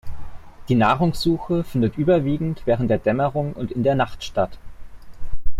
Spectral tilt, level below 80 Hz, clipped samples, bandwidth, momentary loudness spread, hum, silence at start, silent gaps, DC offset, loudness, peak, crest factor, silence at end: -7.5 dB/octave; -36 dBFS; under 0.1%; 13.5 kHz; 9 LU; none; 0.05 s; none; under 0.1%; -21 LUFS; -6 dBFS; 14 dB; 0 s